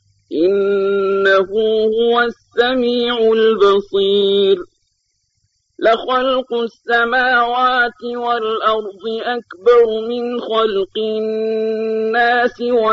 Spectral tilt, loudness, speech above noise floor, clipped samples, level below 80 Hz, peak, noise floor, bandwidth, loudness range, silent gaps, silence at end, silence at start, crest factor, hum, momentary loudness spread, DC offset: -5.5 dB/octave; -16 LUFS; 52 dB; under 0.1%; -54 dBFS; -2 dBFS; -67 dBFS; 7.2 kHz; 3 LU; none; 0 s; 0.3 s; 14 dB; none; 8 LU; under 0.1%